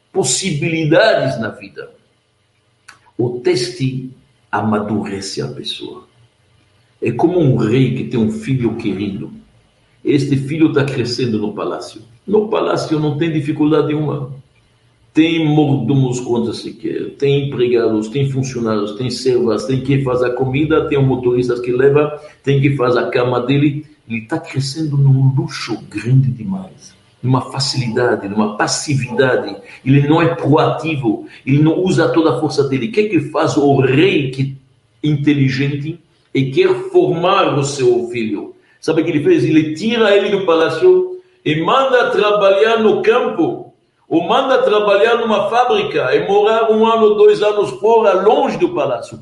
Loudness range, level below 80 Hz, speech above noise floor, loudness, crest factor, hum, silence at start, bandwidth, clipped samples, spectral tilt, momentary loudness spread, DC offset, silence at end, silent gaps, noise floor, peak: 5 LU; -52 dBFS; 45 dB; -15 LUFS; 14 dB; none; 0.15 s; 11.5 kHz; under 0.1%; -6 dB/octave; 11 LU; under 0.1%; 0 s; none; -60 dBFS; 0 dBFS